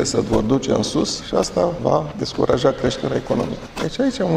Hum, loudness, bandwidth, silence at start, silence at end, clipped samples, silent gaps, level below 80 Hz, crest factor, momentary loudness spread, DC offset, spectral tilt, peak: none; -20 LUFS; 15 kHz; 0 s; 0 s; under 0.1%; none; -40 dBFS; 18 dB; 6 LU; under 0.1%; -5 dB/octave; -2 dBFS